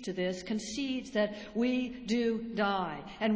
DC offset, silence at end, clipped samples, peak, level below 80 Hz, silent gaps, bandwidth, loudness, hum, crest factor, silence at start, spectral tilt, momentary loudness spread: under 0.1%; 0 s; under 0.1%; -16 dBFS; -62 dBFS; none; 8 kHz; -33 LUFS; none; 16 dB; 0 s; -5 dB/octave; 4 LU